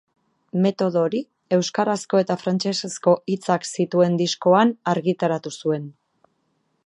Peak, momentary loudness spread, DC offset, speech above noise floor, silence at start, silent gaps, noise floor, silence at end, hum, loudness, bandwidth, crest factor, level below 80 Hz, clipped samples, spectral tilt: -4 dBFS; 8 LU; under 0.1%; 49 dB; 0.55 s; none; -70 dBFS; 0.95 s; none; -22 LUFS; 11.5 kHz; 18 dB; -72 dBFS; under 0.1%; -5.5 dB/octave